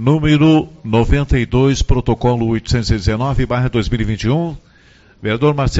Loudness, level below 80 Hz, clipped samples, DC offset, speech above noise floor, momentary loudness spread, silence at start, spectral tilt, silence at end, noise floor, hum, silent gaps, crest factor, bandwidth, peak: -16 LUFS; -24 dBFS; under 0.1%; under 0.1%; 33 dB; 7 LU; 0 s; -6.5 dB/octave; 0 s; -47 dBFS; none; none; 14 dB; 8 kHz; 0 dBFS